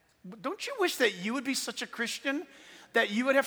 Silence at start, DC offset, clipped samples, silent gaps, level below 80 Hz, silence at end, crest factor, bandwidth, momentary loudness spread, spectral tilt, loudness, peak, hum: 0.25 s; under 0.1%; under 0.1%; none; -80 dBFS; 0 s; 20 dB; over 20 kHz; 12 LU; -2.5 dB/octave; -31 LUFS; -10 dBFS; none